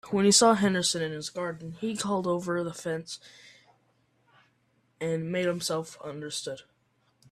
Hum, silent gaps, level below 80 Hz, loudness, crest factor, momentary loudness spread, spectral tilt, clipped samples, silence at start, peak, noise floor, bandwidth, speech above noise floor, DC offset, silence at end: none; none; -68 dBFS; -27 LUFS; 22 dB; 19 LU; -3.5 dB/octave; under 0.1%; 0.05 s; -8 dBFS; -70 dBFS; 15 kHz; 42 dB; under 0.1%; 0.7 s